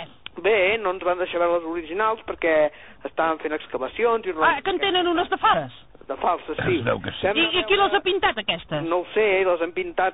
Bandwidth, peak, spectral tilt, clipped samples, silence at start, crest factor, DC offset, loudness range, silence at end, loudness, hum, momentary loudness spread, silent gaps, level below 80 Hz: 4 kHz; -8 dBFS; -1.5 dB/octave; under 0.1%; 0 s; 16 dB; 0.3%; 2 LU; 0 s; -22 LUFS; none; 8 LU; none; -52 dBFS